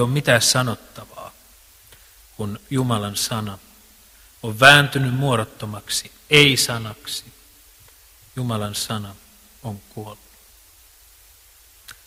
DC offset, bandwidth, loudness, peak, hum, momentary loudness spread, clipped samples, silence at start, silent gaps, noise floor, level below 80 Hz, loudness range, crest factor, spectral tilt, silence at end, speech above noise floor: under 0.1%; 16 kHz; -18 LUFS; 0 dBFS; none; 24 LU; under 0.1%; 0 s; none; -51 dBFS; -52 dBFS; 14 LU; 22 dB; -3.5 dB/octave; 0.15 s; 31 dB